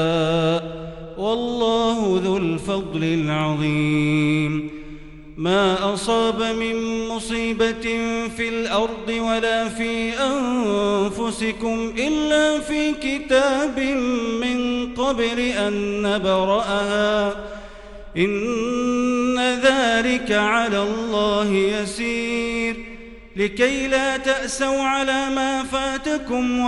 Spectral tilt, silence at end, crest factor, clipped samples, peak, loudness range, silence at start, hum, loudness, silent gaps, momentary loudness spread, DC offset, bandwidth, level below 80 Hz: -4.5 dB/octave; 0 s; 16 dB; under 0.1%; -4 dBFS; 3 LU; 0 s; none; -21 LUFS; none; 7 LU; under 0.1%; 12 kHz; -44 dBFS